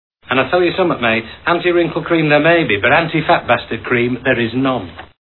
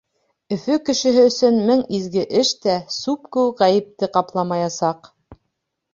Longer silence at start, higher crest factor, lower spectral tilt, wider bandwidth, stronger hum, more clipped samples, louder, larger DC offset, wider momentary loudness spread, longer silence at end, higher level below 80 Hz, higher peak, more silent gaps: second, 0.3 s vs 0.5 s; about the same, 14 dB vs 18 dB; first, -9 dB/octave vs -4.5 dB/octave; second, 4.3 kHz vs 7.6 kHz; neither; neither; first, -15 LUFS vs -19 LUFS; first, 0.1% vs under 0.1%; second, 6 LU vs 9 LU; second, 0.15 s vs 0.6 s; first, -46 dBFS vs -60 dBFS; about the same, 0 dBFS vs -2 dBFS; neither